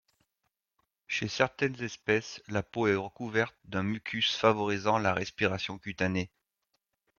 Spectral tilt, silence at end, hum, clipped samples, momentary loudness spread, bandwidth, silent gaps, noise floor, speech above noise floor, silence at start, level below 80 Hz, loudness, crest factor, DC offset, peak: -5 dB/octave; 0.9 s; none; under 0.1%; 9 LU; 7.2 kHz; none; -83 dBFS; 52 dB; 1.1 s; -66 dBFS; -30 LUFS; 24 dB; under 0.1%; -8 dBFS